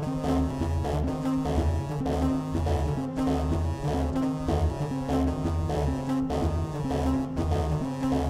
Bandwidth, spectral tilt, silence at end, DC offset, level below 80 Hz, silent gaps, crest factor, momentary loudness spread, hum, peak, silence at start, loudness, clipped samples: 13.5 kHz; -7.5 dB/octave; 0 s; under 0.1%; -34 dBFS; none; 14 dB; 2 LU; none; -14 dBFS; 0 s; -28 LUFS; under 0.1%